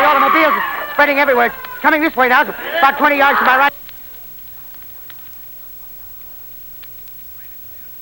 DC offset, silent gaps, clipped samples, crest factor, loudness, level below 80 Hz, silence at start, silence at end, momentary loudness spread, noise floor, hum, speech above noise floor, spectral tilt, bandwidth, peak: under 0.1%; none; under 0.1%; 16 dB; -13 LUFS; -50 dBFS; 0 s; 0 s; 19 LU; -33 dBFS; 60 Hz at -60 dBFS; 20 dB; -3.5 dB/octave; over 20 kHz; 0 dBFS